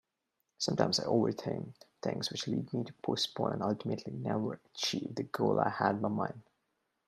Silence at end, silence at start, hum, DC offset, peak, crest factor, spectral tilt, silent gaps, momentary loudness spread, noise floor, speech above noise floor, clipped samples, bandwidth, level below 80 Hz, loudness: 0.65 s; 0.6 s; none; under 0.1%; -10 dBFS; 24 dB; -5 dB/octave; none; 9 LU; -84 dBFS; 50 dB; under 0.1%; 14 kHz; -72 dBFS; -34 LUFS